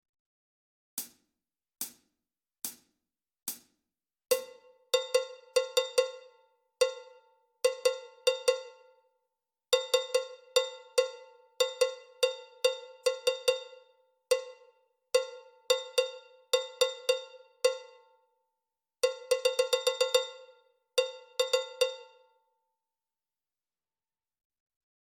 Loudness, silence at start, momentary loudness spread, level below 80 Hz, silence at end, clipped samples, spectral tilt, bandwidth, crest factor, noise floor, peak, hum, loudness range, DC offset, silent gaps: -31 LUFS; 0.95 s; 13 LU; -86 dBFS; 3.05 s; under 0.1%; 2 dB/octave; 18 kHz; 24 dB; under -90 dBFS; -10 dBFS; none; 8 LU; under 0.1%; none